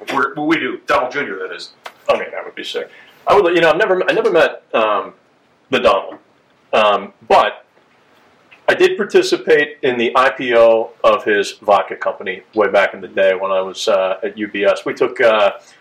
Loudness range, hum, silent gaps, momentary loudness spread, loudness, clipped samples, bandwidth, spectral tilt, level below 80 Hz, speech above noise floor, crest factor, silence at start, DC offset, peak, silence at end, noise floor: 3 LU; none; none; 12 LU; -15 LUFS; under 0.1%; 13.5 kHz; -4 dB/octave; -56 dBFS; 38 dB; 16 dB; 0 s; under 0.1%; 0 dBFS; 0.2 s; -53 dBFS